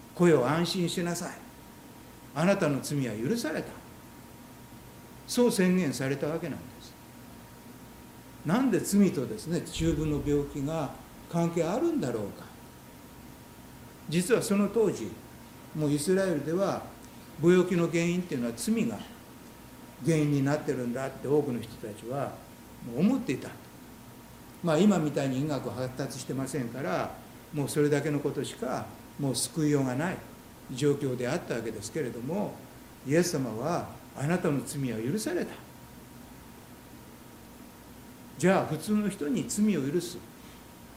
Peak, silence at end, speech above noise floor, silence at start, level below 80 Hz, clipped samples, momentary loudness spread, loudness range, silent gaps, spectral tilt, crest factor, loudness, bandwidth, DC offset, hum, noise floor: -12 dBFS; 0 s; 21 dB; 0 s; -56 dBFS; under 0.1%; 23 LU; 4 LU; none; -6 dB/octave; 20 dB; -29 LUFS; 16.5 kHz; under 0.1%; none; -49 dBFS